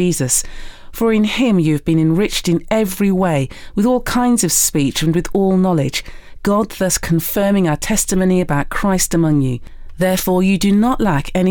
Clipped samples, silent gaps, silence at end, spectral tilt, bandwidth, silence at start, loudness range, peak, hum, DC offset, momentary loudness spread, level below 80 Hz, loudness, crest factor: under 0.1%; none; 0 s; -5 dB/octave; over 20 kHz; 0 s; 1 LU; -4 dBFS; none; under 0.1%; 5 LU; -32 dBFS; -16 LUFS; 12 dB